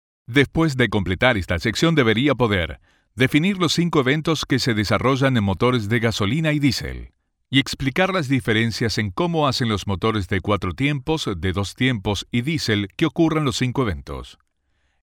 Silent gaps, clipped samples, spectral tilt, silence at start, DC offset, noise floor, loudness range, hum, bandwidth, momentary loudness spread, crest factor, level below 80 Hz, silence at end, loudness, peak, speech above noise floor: none; under 0.1%; -5.5 dB/octave; 0.3 s; under 0.1%; -67 dBFS; 3 LU; none; 17.5 kHz; 6 LU; 20 dB; -42 dBFS; 0.7 s; -20 LUFS; -2 dBFS; 47 dB